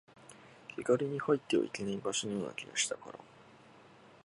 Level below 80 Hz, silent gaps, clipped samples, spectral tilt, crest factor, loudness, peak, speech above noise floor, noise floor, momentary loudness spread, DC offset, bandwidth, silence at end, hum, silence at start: -74 dBFS; none; under 0.1%; -3.5 dB/octave; 22 dB; -34 LUFS; -16 dBFS; 24 dB; -59 dBFS; 20 LU; under 0.1%; 11.5 kHz; 0.45 s; none; 0.2 s